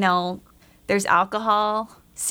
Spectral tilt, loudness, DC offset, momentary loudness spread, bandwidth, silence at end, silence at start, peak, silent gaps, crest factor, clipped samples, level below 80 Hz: -3.5 dB/octave; -22 LUFS; under 0.1%; 17 LU; over 20 kHz; 0 s; 0 s; -4 dBFS; none; 18 dB; under 0.1%; -58 dBFS